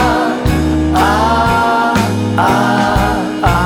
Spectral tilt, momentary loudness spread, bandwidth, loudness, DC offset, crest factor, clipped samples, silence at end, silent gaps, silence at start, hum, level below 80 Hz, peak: -6 dB/octave; 3 LU; 18 kHz; -13 LUFS; under 0.1%; 12 dB; under 0.1%; 0 s; none; 0 s; none; -24 dBFS; 0 dBFS